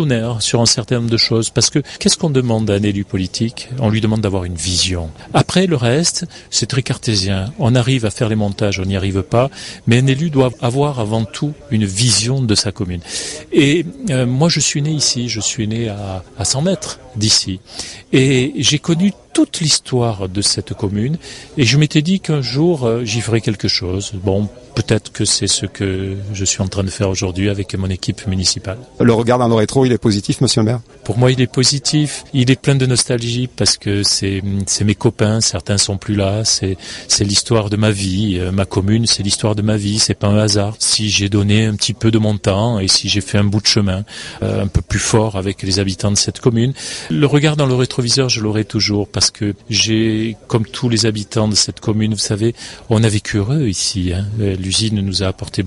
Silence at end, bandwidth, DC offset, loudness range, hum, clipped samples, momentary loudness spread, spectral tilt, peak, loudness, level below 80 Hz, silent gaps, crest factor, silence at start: 0 s; 11.5 kHz; under 0.1%; 3 LU; none; under 0.1%; 7 LU; -4.5 dB/octave; 0 dBFS; -15 LUFS; -36 dBFS; none; 16 dB; 0 s